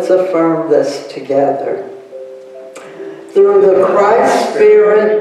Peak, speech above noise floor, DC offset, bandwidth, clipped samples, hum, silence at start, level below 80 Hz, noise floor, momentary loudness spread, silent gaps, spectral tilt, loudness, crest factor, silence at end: 0 dBFS; 21 dB; under 0.1%; 11.5 kHz; under 0.1%; none; 0 s; -60 dBFS; -32 dBFS; 22 LU; none; -5.5 dB/octave; -11 LUFS; 12 dB; 0 s